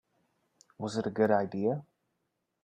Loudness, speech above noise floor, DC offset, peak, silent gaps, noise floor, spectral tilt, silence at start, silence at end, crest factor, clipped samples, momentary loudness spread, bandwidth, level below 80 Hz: -31 LUFS; 52 dB; under 0.1%; -12 dBFS; none; -81 dBFS; -7 dB/octave; 0.8 s; 0.85 s; 22 dB; under 0.1%; 11 LU; 10 kHz; -74 dBFS